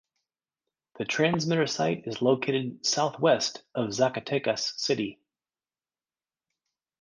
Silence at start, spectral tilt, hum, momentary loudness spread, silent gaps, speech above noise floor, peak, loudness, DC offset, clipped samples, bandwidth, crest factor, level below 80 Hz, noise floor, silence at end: 0.95 s; -4 dB/octave; none; 7 LU; none; over 63 dB; -10 dBFS; -27 LUFS; under 0.1%; under 0.1%; 10 kHz; 20 dB; -70 dBFS; under -90 dBFS; 1.9 s